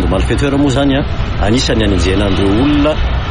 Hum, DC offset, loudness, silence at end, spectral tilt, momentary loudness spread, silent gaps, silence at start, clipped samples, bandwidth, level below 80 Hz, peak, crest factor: none; under 0.1%; -13 LUFS; 0 s; -6 dB/octave; 4 LU; none; 0 s; under 0.1%; 11 kHz; -18 dBFS; -2 dBFS; 10 dB